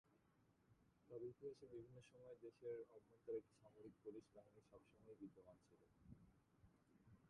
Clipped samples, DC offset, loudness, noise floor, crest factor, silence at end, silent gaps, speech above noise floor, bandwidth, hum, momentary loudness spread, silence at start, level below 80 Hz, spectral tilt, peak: under 0.1%; under 0.1%; -59 LUFS; -80 dBFS; 20 dB; 0 s; none; 21 dB; 10 kHz; none; 14 LU; 0.05 s; -84 dBFS; -7.5 dB/octave; -42 dBFS